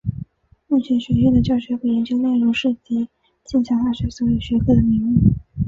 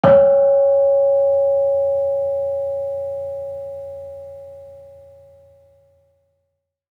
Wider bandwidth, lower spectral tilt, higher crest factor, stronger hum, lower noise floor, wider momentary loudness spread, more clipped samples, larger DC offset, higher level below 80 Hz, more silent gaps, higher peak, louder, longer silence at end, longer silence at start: first, 7.4 kHz vs 3.6 kHz; about the same, -8 dB/octave vs -8.5 dB/octave; about the same, 16 dB vs 18 dB; neither; second, -39 dBFS vs -75 dBFS; second, 9 LU vs 21 LU; neither; neither; first, -34 dBFS vs -56 dBFS; neither; about the same, -2 dBFS vs -2 dBFS; about the same, -19 LUFS vs -17 LUFS; second, 0 s vs 2.05 s; about the same, 0.05 s vs 0.05 s